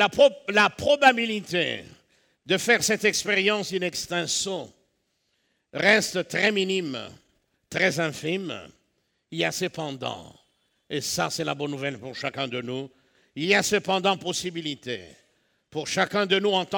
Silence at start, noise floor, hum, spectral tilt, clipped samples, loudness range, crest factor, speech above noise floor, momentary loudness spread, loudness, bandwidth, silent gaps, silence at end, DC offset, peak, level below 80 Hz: 0 s; -73 dBFS; none; -3 dB/octave; under 0.1%; 8 LU; 22 dB; 48 dB; 16 LU; -24 LUFS; over 20 kHz; none; 0 s; under 0.1%; -4 dBFS; -66 dBFS